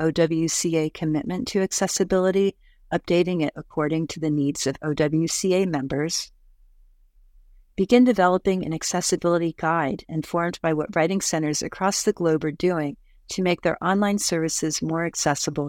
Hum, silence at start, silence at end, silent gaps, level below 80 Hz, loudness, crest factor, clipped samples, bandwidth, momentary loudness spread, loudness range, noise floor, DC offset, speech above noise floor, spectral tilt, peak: none; 0 s; 0 s; none; -52 dBFS; -23 LUFS; 20 dB; under 0.1%; 17.5 kHz; 6 LU; 2 LU; -55 dBFS; under 0.1%; 32 dB; -4.5 dB/octave; -2 dBFS